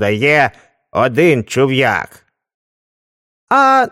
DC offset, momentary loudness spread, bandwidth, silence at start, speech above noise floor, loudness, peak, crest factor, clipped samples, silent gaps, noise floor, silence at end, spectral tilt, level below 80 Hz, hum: under 0.1%; 9 LU; 15.5 kHz; 0 s; over 77 dB; -13 LUFS; 0 dBFS; 14 dB; under 0.1%; 2.54-3.47 s; under -90 dBFS; 0 s; -5.5 dB/octave; -54 dBFS; none